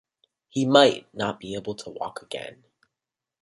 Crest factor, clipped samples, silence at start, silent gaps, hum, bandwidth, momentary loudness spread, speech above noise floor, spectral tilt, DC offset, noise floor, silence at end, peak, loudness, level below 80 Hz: 24 dB; under 0.1%; 0.55 s; none; none; 11.5 kHz; 18 LU; 64 dB; -4.5 dB/octave; under 0.1%; -88 dBFS; 0.9 s; -2 dBFS; -24 LUFS; -66 dBFS